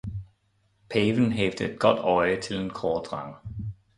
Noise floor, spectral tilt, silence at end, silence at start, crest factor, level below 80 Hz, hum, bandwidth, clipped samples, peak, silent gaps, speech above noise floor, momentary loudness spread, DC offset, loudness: -68 dBFS; -6 dB/octave; 0.25 s; 0.05 s; 22 dB; -50 dBFS; none; 11.5 kHz; under 0.1%; -4 dBFS; none; 43 dB; 15 LU; under 0.1%; -26 LUFS